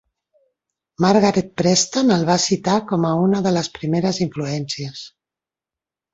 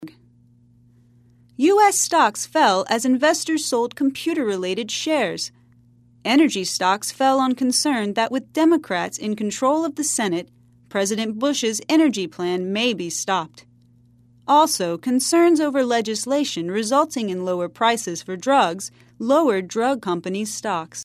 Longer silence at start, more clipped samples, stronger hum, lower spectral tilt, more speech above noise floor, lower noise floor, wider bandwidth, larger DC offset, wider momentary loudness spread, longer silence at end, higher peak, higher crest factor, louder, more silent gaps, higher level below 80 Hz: first, 1 s vs 0 s; neither; neither; first, -5 dB/octave vs -3 dB/octave; first, 70 dB vs 34 dB; first, -89 dBFS vs -54 dBFS; second, 8 kHz vs 14 kHz; neither; about the same, 10 LU vs 9 LU; first, 1.05 s vs 0 s; about the same, -2 dBFS vs -4 dBFS; about the same, 18 dB vs 18 dB; about the same, -19 LUFS vs -20 LUFS; neither; first, -56 dBFS vs -68 dBFS